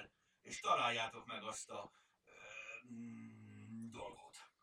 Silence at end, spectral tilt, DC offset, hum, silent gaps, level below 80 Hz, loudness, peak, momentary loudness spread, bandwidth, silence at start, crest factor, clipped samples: 0.15 s; -2.5 dB/octave; under 0.1%; none; none; -80 dBFS; -44 LUFS; -22 dBFS; 23 LU; 15.5 kHz; 0 s; 24 dB; under 0.1%